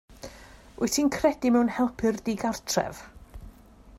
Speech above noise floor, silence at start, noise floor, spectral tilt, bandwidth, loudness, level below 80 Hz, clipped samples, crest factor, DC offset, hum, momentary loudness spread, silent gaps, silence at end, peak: 25 dB; 0.1 s; -51 dBFS; -4 dB/octave; 16 kHz; -26 LUFS; -50 dBFS; under 0.1%; 18 dB; under 0.1%; none; 21 LU; none; 0 s; -10 dBFS